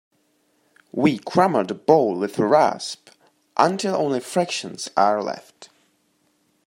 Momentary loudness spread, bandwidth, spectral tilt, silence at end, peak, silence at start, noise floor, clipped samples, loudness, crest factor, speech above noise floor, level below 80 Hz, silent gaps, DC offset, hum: 13 LU; 16 kHz; -5 dB/octave; 1 s; -2 dBFS; 0.95 s; -66 dBFS; under 0.1%; -21 LUFS; 20 dB; 45 dB; -70 dBFS; none; under 0.1%; none